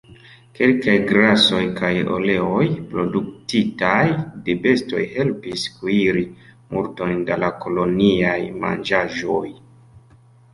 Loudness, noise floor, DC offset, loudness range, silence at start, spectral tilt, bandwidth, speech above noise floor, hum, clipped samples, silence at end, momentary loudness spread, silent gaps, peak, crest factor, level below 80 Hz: -19 LUFS; -50 dBFS; under 0.1%; 4 LU; 0.1 s; -6 dB/octave; 11.5 kHz; 31 dB; none; under 0.1%; 1 s; 10 LU; none; -2 dBFS; 18 dB; -50 dBFS